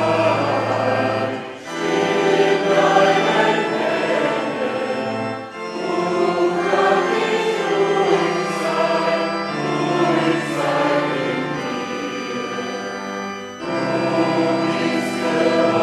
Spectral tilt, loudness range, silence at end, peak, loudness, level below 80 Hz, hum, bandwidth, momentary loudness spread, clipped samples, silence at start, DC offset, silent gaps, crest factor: -5 dB/octave; 5 LU; 0 s; 0 dBFS; -19 LUFS; -62 dBFS; none; 13.5 kHz; 9 LU; under 0.1%; 0 s; under 0.1%; none; 18 dB